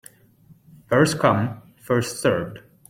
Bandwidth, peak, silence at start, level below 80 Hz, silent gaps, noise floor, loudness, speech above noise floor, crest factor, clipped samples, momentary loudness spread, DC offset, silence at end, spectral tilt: 16.5 kHz; -4 dBFS; 0.9 s; -56 dBFS; none; -53 dBFS; -21 LUFS; 33 dB; 20 dB; under 0.1%; 13 LU; under 0.1%; 0.3 s; -5.5 dB/octave